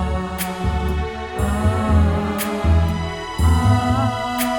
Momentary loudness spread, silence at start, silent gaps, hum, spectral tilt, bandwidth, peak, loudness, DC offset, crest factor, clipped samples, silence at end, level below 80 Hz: 8 LU; 0 s; none; none; -6 dB/octave; over 20 kHz; -4 dBFS; -20 LUFS; under 0.1%; 14 dB; under 0.1%; 0 s; -24 dBFS